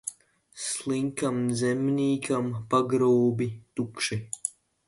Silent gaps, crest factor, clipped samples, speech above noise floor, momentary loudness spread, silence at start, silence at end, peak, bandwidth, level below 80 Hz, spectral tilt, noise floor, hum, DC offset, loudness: none; 18 dB; under 0.1%; 28 dB; 11 LU; 0.05 s; 0.4 s; -10 dBFS; 11.5 kHz; -64 dBFS; -5 dB/octave; -54 dBFS; none; under 0.1%; -27 LUFS